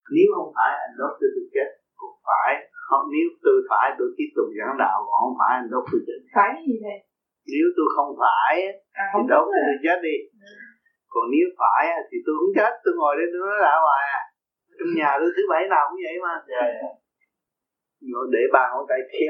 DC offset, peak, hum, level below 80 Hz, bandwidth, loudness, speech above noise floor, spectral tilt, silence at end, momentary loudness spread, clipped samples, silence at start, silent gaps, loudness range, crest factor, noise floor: under 0.1%; -2 dBFS; none; -82 dBFS; 6 kHz; -22 LUFS; 64 dB; -7 dB/octave; 0 s; 11 LU; under 0.1%; 0.1 s; none; 3 LU; 20 dB; -85 dBFS